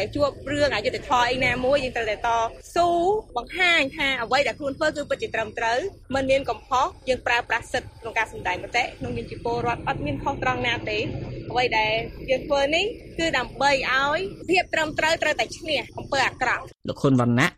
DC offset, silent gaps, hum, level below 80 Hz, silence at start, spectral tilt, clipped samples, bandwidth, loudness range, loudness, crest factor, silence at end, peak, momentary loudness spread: under 0.1%; none; none; -46 dBFS; 0 s; -4.5 dB/octave; under 0.1%; 15 kHz; 4 LU; -24 LUFS; 16 dB; 0.05 s; -8 dBFS; 7 LU